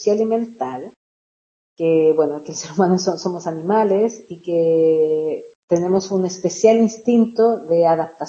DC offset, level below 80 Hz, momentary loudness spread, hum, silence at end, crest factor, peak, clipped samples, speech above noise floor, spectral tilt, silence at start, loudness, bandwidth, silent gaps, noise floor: under 0.1%; -68 dBFS; 11 LU; none; 0 s; 16 dB; -2 dBFS; under 0.1%; over 73 dB; -6 dB/octave; 0 s; -18 LUFS; 7.6 kHz; 0.96-1.76 s, 5.55-5.68 s; under -90 dBFS